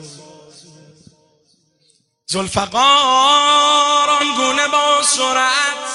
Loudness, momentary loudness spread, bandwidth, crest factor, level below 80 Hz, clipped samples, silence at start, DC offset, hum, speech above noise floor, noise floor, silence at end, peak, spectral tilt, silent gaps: -13 LUFS; 8 LU; 11.5 kHz; 16 dB; -54 dBFS; under 0.1%; 0 s; under 0.1%; none; 46 dB; -60 dBFS; 0 s; 0 dBFS; -1 dB/octave; none